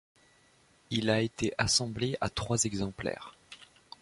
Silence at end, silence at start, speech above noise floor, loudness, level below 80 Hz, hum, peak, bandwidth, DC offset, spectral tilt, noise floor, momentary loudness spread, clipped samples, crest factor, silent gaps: 0.35 s; 0.9 s; 33 dB; -31 LUFS; -54 dBFS; none; -12 dBFS; 11.5 kHz; under 0.1%; -3.5 dB/octave; -64 dBFS; 24 LU; under 0.1%; 22 dB; none